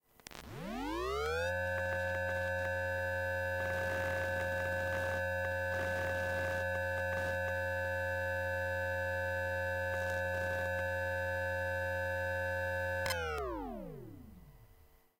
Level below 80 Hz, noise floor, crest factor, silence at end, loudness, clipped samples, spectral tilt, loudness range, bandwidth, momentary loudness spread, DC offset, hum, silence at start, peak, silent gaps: -58 dBFS; -63 dBFS; 18 dB; 0.55 s; -36 LUFS; under 0.1%; -5 dB/octave; 1 LU; 16 kHz; 5 LU; under 0.1%; none; 0.3 s; -18 dBFS; none